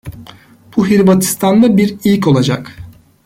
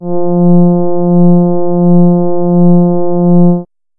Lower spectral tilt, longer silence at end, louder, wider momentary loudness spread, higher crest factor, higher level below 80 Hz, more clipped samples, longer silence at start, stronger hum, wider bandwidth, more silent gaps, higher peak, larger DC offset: second, -6 dB/octave vs -19 dB/octave; about the same, 0.35 s vs 0.35 s; second, -12 LUFS vs -9 LUFS; first, 12 LU vs 4 LU; first, 12 dB vs 6 dB; about the same, -44 dBFS vs -44 dBFS; neither; about the same, 0.05 s vs 0 s; neither; first, 17 kHz vs 1.5 kHz; neither; about the same, -2 dBFS vs 0 dBFS; neither